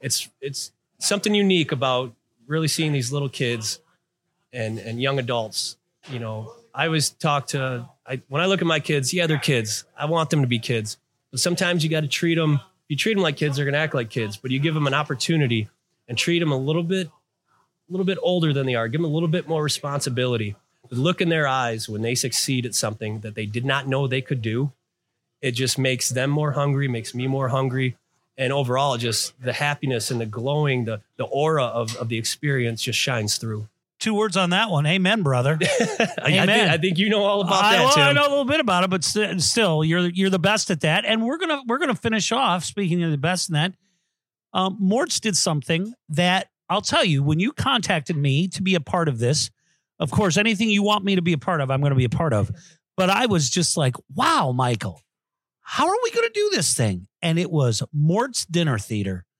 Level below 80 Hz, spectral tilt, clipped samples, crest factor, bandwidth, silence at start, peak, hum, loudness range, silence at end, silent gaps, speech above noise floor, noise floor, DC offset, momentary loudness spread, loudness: -60 dBFS; -4.5 dB/octave; under 0.1%; 20 dB; 16.5 kHz; 0.05 s; -2 dBFS; none; 6 LU; 0.15 s; none; 67 dB; -88 dBFS; under 0.1%; 9 LU; -22 LUFS